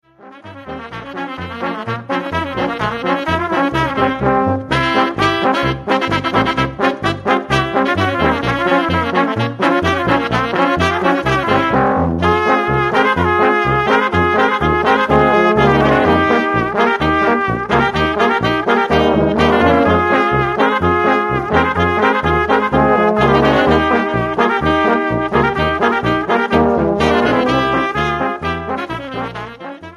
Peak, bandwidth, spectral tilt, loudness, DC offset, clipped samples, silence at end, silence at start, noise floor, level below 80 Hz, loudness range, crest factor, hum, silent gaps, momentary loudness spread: 0 dBFS; 13 kHz; -6.5 dB/octave; -14 LUFS; under 0.1%; under 0.1%; 0 s; 0.25 s; -37 dBFS; -34 dBFS; 3 LU; 14 dB; none; none; 8 LU